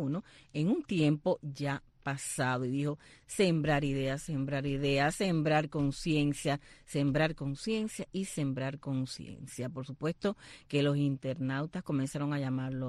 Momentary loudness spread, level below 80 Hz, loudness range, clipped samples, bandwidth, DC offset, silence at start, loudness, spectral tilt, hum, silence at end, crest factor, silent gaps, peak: 10 LU; -56 dBFS; 4 LU; under 0.1%; 12.5 kHz; under 0.1%; 0 s; -33 LUFS; -6 dB/octave; none; 0 s; 18 dB; none; -16 dBFS